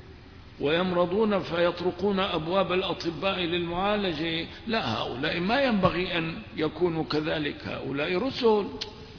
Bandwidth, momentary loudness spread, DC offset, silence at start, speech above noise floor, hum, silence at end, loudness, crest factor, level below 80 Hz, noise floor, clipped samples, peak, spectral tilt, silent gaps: 5.4 kHz; 7 LU; under 0.1%; 0 s; 20 dB; none; 0 s; -27 LUFS; 18 dB; -50 dBFS; -47 dBFS; under 0.1%; -10 dBFS; -6.5 dB/octave; none